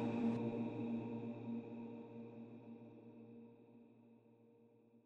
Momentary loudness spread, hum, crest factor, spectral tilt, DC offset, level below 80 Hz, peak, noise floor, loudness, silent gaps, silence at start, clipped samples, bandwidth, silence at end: 24 LU; none; 18 dB; -9 dB/octave; under 0.1%; -82 dBFS; -28 dBFS; -69 dBFS; -46 LUFS; none; 0 s; under 0.1%; 5.8 kHz; 0.05 s